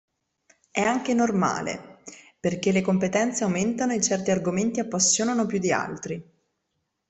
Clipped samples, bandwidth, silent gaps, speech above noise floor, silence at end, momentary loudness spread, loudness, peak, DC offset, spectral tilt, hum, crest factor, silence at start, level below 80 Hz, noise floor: under 0.1%; 8.4 kHz; none; 54 dB; 0.85 s; 13 LU; -24 LUFS; -6 dBFS; under 0.1%; -4 dB/octave; none; 20 dB; 0.75 s; -62 dBFS; -78 dBFS